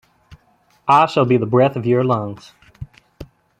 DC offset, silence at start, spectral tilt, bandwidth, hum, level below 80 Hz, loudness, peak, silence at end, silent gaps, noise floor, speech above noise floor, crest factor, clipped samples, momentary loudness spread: under 0.1%; 0.3 s; -8 dB/octave; 9 kHz; none; -50 dBFS; -16 LUFS; -2 dBFS; 0.35 s; none; -58 dBFS; 42 dB; 18 dB; under 0.1%; 24 LU